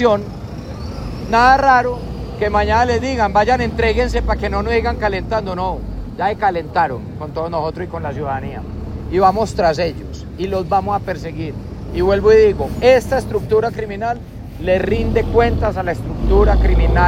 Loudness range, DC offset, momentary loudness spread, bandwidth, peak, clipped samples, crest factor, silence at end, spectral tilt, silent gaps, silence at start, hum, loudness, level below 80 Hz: 5 LU; under 0.1%; 15 LU; 14.5 kHz; 0 dBFS; under 0.1%; 16 dB; 0 s; -6.5 dB/octave; none; 0 s; none; -17 LUFS; -24 dBFS